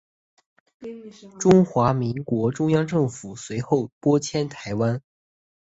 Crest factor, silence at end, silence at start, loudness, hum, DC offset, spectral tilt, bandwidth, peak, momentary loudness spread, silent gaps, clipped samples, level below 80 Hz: 20 dB; 0.7 s; 0.8 s; -22 LUFS; none; under 0.1%; -7 dB/octave; 8.2 kHz; -2 dBFS; 20 LU; 3.92-4.01 s; under 0.1%; -54 dBFS